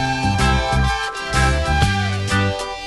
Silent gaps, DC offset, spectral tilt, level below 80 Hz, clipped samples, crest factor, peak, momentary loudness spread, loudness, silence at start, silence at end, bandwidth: none; 0.3%; -4.5 dB/octave; -24 dBFS; under 0.1%; 16 dB; -4 dBFS; 4 LU; -18 LUFS; 0 s; 0 s; 12 kHz